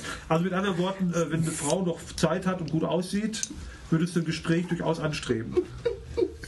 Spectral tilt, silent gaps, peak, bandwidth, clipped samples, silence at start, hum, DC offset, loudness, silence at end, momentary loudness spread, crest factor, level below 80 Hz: -5.5 dB/octave; none; -8 dBFS; 12.5 kHz; under 0.1%; 0 s; none; under 0.1%; -28 LUFS; 0 s; 5 LU; 20 dB; -48 dBFS